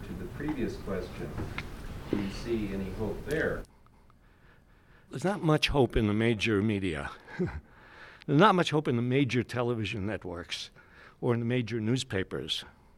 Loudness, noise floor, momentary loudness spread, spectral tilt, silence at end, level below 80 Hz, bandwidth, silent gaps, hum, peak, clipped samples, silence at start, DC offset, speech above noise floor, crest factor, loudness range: -30 LUFS; -59 dBFS; 14 LU; -6 dB/octave; 0.25 s; -46 dBFS; 16.5 kHz; none; none; -8 dBFS; under 0.1%; 0 s; under 0.1%; 29 dB; 22 dB; 7 LU